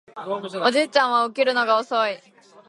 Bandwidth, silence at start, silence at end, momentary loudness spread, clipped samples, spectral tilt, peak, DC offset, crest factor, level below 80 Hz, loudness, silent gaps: 11.5 kHz; 0.15 s; 0.5 s; 11 LU; under 0.1%; -3 dB/octave; -2 dBFS; under 0.1%; 20 dB; -78 dBFS; -21 LUFS; none